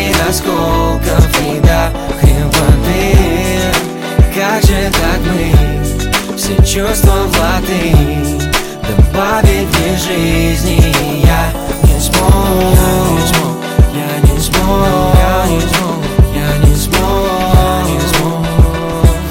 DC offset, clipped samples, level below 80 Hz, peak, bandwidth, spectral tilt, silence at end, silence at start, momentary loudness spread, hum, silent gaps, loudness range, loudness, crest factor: under 0.1%; under 0.1%; -14 dBFS; 0 dBFS; 17 kHz; -5 dB/octave; 0 s; 0 s; 4 LU; none; none; 1 LU; -11 LUFS; 10 dB